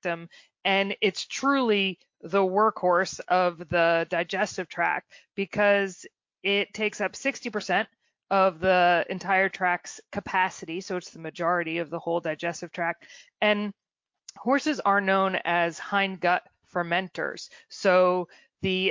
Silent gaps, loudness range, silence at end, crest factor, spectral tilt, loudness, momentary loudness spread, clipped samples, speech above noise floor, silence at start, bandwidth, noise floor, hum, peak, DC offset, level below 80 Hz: none; 4 LU; 0 s; 18 dB; -4.5 dB/octave; -26 LUFS; 11 LU; under 0.1%; 27 dB; 0.05 s; 7.6 kHz; -53 dBFS; none; -10 dBFS; under 0.1%; -64 dBFS